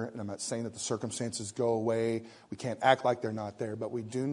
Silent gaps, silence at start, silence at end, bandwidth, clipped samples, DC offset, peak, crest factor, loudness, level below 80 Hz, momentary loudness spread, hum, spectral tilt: none; 0 s; 0 s; 11 kHz; under 0.1%; under 0.1%; -8 dBFS; 24 dB; -33 LUFS; -72 dBFS; 11 LU; none; -4.5 dB/octave